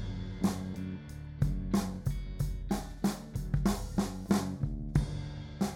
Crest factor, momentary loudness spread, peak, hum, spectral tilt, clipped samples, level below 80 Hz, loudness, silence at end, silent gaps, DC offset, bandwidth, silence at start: 18 dB; 8 LU; -14 dBFS; none; -6.5 dB/octave; under 0.1%; -40 dBFS; -35 LUFS; 0 s; none; under 0.1%; 16.5 kHz; 0 s